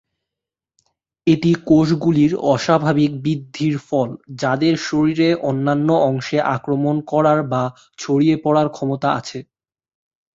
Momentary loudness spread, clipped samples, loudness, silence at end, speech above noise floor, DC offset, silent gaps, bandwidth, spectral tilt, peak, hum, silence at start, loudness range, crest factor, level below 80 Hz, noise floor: 8 LU; under 0.1%; -18 LUFS; 0.9 s; 69 dB; under 0.1%; none; 7.8 kHz; -7 dB/octave; -2 dBFS; none; 1.25 s; 2 LU; 16 dB; -56 dBFS; -86 dBFS